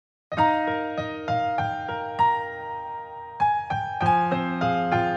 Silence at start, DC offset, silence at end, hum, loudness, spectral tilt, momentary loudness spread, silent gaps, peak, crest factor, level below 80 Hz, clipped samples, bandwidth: 0.3 s; under 0.1%; 0 s; none; -25 LUFS; -7 dB/octave; 11 LU; none; -8 dBFS; 16 dB; -56 dBFS; under 0.1%; 8.6 kHz